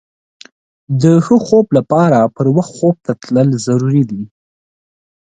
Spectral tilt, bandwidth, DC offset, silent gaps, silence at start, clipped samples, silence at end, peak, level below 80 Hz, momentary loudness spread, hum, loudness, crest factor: -8 dB/octave; 9.4 kHz; under 0.1%; none; 0.9 s; under 0.1%; 1 s; 0 dBFS; -54 dBFS; 9 LU; none; -13 LUFS; 14 dB